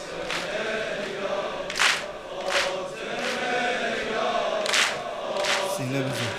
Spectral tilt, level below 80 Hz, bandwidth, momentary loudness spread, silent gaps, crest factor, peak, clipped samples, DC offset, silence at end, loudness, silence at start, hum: -2.5 dB/octave; -58 dBFS; 15.5 kHz; 8 LU; none; 24 dB; -2 dBFS; under 0.1%; under 0.1%; 0 s; -26 LUFS; 0 s; none